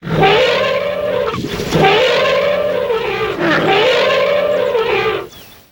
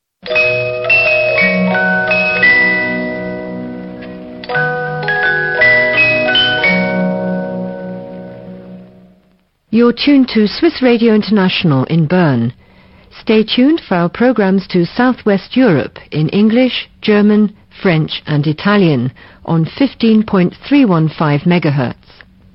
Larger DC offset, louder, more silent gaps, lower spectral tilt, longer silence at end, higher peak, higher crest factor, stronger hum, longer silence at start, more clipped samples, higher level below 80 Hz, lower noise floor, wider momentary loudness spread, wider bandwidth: neither; about the same, -14 LUFS vs -12 LUFS; neither; second, -5 dB/octave vs -9.5 dB/octave; second, 0.25 s vs 0.6 s; about the same, 0 dBFS vs 0 dBFS; about the same, 14 dB vs 12 dB; neither; second, 0 s vs 0.25 s; neither; about the same, -42 dBFS vs -46 dBFS; second, -34 dBFS vs -55 dBFS; second, 7 LU vs 14 LU; first, 18 kHz vs 5.8 kHz